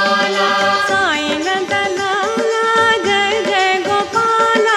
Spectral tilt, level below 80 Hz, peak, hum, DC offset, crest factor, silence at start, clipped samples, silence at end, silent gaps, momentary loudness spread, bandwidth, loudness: -2.5 dB/octave; -56 dBFS; -2 dBFS; none; under 0.1%; 14 dB; 0 s; under 0.1%; 0 s; none; 4 LU; 14 kHz; -14 LUFS